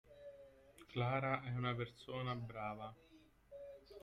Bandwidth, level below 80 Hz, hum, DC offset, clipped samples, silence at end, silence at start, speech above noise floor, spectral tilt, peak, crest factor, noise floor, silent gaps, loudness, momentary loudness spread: 10.5 kHz; -70 dBFS; none; under 0.1%; under 0.1%; 0 s; 0.05 s; 21 dB; -7.5 dB/octave; -22 dBFS; 22 dB; -63 dBFS; none; -43 LUFS; 22 LU